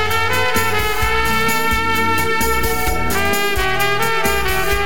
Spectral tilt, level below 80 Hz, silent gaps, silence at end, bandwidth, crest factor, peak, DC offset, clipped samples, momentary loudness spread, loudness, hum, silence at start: -3 dB/octave; -28 dBFS; none; 0 s; 18 kHz; 14 dB; -4 dBFS; 9%; under 0.1%; 2 LU; -17 LUFS; none; 0 s